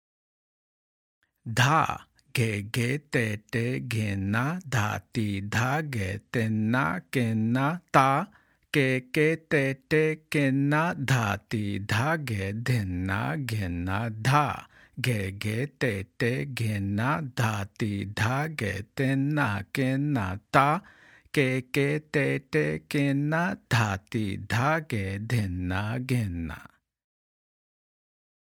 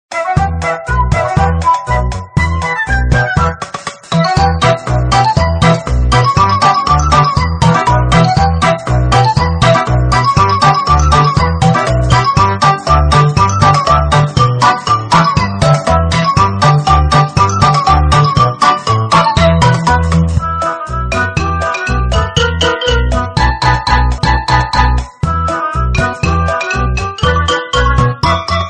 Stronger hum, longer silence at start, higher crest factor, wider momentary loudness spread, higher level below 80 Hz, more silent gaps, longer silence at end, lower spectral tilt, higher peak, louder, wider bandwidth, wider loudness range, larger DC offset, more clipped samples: neither; first, 1.45 s vs 0.1 s; first, 24 dB vs 10 dB; about the same, 7 LU vs 6 LU; second, -56 dBFS vs -18 dBFS; neither; first, 1.85 s vs 0 s; about the same, -6 dB/octave vs -5.5 dB/octave; second, -4 dBFS vs 0 dBFS; second, -27 LUFS vs -11 LUFS; first, 17 kHz vs 10 kHz; about the same, 4 LU vs 4 LU; neither; neither